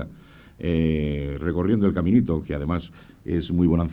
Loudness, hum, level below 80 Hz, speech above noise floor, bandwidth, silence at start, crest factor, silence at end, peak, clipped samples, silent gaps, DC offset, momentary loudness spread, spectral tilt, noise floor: -23 LUFS; none; -36 dBFS; 25 dB; 4.6 kHz; 0 s; 16 dB; 0 s; -6 dBFS; under 0.1%; none; under 0.1%; 9 LU; -10.5 dB/octave; -47 dBFS